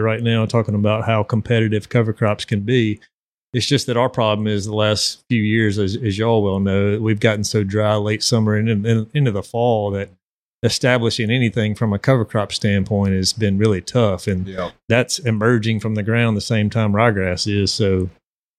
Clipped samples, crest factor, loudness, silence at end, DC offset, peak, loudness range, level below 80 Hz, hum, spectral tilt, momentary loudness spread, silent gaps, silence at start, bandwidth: under 0.1%; 18 dB; -18 LUFS; 0.5 s; under 0.1%; 0 dBFS; 1 LU; -54 dBFS; none; -5.5 dB/octave; 4 LU; 3.14-3.53 s, 10.23-10.62 s, 14.84-14.88 s; 0 s; 13.5 kHz